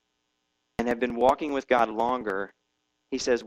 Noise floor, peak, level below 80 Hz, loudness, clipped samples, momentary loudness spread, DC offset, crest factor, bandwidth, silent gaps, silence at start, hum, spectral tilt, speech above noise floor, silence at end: -77 dBFS; -8 dBFS; -56 dBFS; -27 LUFS; under 0.1%; 12 LU; under 0.1%; 20 dB; 13.5 kHz; none; 0.8 s; none; -4 dB/octave; 51 dB; 0 s